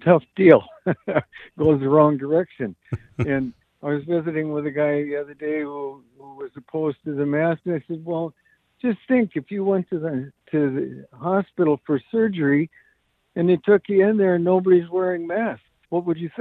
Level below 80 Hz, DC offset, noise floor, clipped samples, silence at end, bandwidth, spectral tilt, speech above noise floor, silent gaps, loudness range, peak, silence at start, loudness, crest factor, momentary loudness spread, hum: -60 dBFS; under 0.1%; -65 dBFS; under 0.1%; 0 s; 4.1 kHz; -10.5 dB/octave; 44 dB; none; 6 LU; 0 dBFS; 0 s; -22 LUFS; 22 dB; 14 LU; none